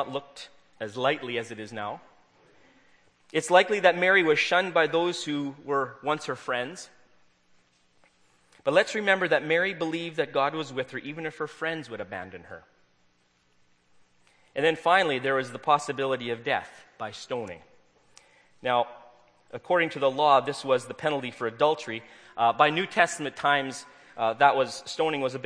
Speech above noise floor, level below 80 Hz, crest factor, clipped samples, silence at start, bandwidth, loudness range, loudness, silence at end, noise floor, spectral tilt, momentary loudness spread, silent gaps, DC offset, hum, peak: 40 dB; -76 dBFS; 24 dB; under 0.1%; 0 s; 10.5 kHz; 10 LU; -26 LUFS; 0 s; -67 dBFS; -4 dB/octave; 17 LU; none; under 0.1%; none; -4 dBFS